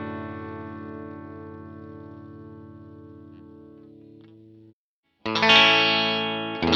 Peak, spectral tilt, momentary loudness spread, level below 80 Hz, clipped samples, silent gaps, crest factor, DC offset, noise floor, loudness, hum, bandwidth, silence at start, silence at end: -2 dBFS; -4 dB/octave; 29 LU; -56 dBFS; under 0.1%; 4.73-5.03 s; 24 dB; under 0.1%; -73 dBFS; -19 LUFS; none; 9 kHz; 0 s; 0 s